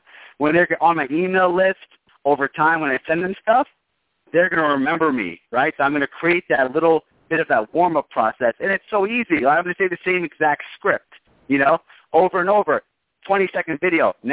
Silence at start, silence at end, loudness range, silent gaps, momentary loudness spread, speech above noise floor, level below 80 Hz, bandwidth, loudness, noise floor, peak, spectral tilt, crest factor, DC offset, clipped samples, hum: 0.4 s; 0 s; 1 LU; none; 5 LU; 53 dB; -62 dBFS; 4 kHz; -19 LUFS; -72 dBFS; -4 dBFS; -9 dB/octave; 16 dB; under 0.1%; under 0.1%; none